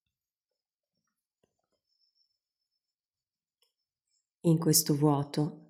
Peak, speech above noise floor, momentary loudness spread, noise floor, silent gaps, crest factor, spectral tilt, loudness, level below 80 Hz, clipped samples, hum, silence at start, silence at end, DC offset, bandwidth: -12 dBFS; over 63 dB; 8 LU; under -90 dBFS; none; 22 dB; -5 dB/octave; -27 LUFS; -72 dBFS; under 0.1%; none; 4.45 s; 0.15 s; under 0.1%; 17 kHz